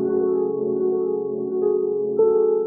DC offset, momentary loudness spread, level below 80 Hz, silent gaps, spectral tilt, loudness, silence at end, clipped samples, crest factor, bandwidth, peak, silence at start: under 0.1%; 6 LU; -68 dBFS; none; -15 dB/octave; -22 LUFS; 0 s; under 0.1%; 12 dB; 1.6 kHz; -8 dBFS; 0 s